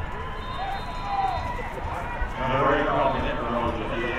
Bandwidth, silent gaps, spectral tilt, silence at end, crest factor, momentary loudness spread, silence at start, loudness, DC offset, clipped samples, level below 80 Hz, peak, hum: 13.5 kHz; none; -6.5 dB/octave; 0 s; 16 dB; 10 LU; 0 s; -27 LUFS; under 0.1%; under 0.1%; -34 dBFS; -10 dBFS; none